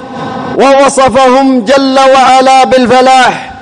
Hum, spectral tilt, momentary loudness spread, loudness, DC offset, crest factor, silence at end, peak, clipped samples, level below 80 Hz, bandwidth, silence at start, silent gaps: none; -3.5 dB/octave; 6 LU; -5 LUFS; under 0.1%; 6 dB; 0 s; 0 dBFS; 0.9%; -40 dBFS; 10.5 kHz; 0 s; none